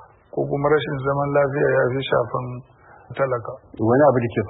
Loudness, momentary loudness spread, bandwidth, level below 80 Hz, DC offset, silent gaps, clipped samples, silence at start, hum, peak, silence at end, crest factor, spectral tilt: -21 LUFS; 16 LU; 4 kHz; -52 dBFS; under 0.1%; none; under 0.1%; 0 s; none; -4 dBFS; 0 s; 16 dB; -12 dB/octave